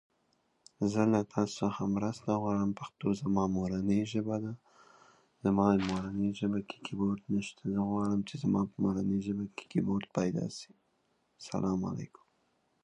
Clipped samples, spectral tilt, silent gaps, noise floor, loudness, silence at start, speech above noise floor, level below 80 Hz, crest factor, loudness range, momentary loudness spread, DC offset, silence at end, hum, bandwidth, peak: under 0.1%; -7 dB/octave; none; -75 dBFS; -33 LUFS; 0.8 s; 43 dB; -60 dBFS; 20 dB; 3 LU; 9 LU; under 0.1%; 0.8 s; none; 9.4 kHz; -14 dBFS